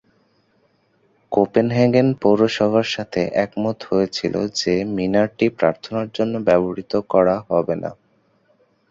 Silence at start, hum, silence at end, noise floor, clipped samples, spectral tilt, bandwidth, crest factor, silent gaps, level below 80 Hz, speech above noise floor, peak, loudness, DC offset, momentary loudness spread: 1.3 s; none; 0.95 s; -62 dBFS; under 0.1%; -6 dB/octave; 7.8 kHz; 18 dB; none; -54 dBFS; 43 dB; -2 dBFS; -19 LUFS; under 0.1%; 7 LU